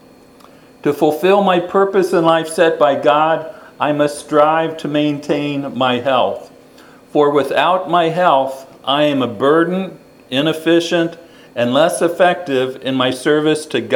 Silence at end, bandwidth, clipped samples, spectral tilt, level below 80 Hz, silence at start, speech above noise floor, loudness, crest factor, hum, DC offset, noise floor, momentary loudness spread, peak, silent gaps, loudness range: 0 s; 18.5 kHz; under 0.1%; -5 dB/octave; -62 dBFS; 0.85 s; 29 dB; -15 LUFS; 16 dB; none; under 0.1%; -44 dBFS; 8 LU; 0 dBFS; none; 3 LU